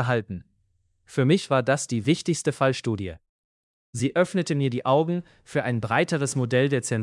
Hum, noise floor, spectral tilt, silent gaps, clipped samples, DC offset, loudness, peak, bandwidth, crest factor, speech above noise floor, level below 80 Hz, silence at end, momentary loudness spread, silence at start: none; -68 dBFS; -5.5 dB/octave; 3.29-3.93 s; under 0.1%; under 0.1%; -24 LUFS; -8 dBFS; 12 kHz; 18 dB; 45 dB; -62 dBFS; 0 s; 9 LU; 0 s